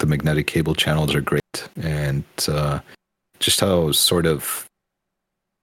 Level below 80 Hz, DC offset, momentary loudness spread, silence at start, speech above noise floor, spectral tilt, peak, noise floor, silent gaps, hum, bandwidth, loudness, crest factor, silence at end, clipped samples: -42 dBFS; under 0.1%; 11 LU; 0 s; 59 dB; -4 dB/octave; -4 dBFS; -79 dBFS; none; none; 17 kHz; -20 LUFS; 18 dB; 1 s; under 0.1%